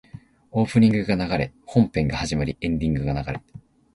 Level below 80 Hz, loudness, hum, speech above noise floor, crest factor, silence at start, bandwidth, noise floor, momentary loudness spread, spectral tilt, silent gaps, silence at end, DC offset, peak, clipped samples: -40 dBFS; -23 LUFS; none; 23 dB; 18 dB; 0.15 s; 11.5 kHz; -45 dBFS; 10 LU; -7 dB/octave; none; 0.35 s; under 0.1%; -4 dBFS; under 0.1%